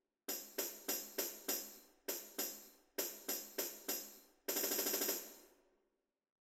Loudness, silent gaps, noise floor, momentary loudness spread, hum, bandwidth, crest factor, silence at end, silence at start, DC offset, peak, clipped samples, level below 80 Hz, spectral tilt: -41 LUFS; none; -86 dBFS; 13 LU; none; 16.5 kHz; 22 dB; 1.1 s; 0.3 s; under 0.1%; -24 dBFS; under 0.1%; -84 dBFS; 0 dB/octave